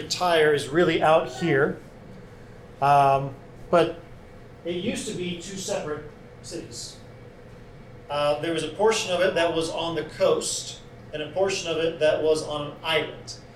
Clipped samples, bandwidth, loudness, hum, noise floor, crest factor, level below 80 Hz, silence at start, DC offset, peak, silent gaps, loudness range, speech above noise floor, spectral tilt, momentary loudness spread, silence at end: under 0.1%; 15 kHz; -24 LUFS; none; -45 dBFS; 16 dB; -52 dBFS; 0 s; under 0.1%; -8 dBFS; none; 10 LU; 21 dB; -4 dB/octave; 19 LU; 0 s